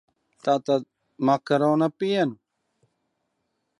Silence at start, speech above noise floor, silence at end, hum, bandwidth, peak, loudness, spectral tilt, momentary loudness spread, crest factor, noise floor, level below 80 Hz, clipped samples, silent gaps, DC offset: 0.45 s; 54 dB; 1.45 s; none; 11 kHz; -8 dBFS; -24 LUFS; -7 dB/octave; 5 LU; 18 dB; -76 dBFS; -78 dBFS; under 0.1%; none; under 0.1%